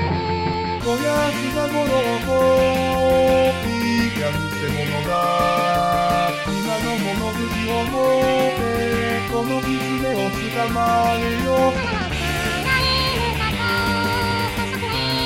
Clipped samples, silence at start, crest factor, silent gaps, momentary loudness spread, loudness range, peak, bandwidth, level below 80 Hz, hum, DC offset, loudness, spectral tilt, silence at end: under 0.1%; 0 s; 14 dB; none; 6 LU; 2 LU; -6 dBFS; 17 kHz; -36 dBFS; none; 0.2%; -20 LUFS; -5 dB/octave; 0 s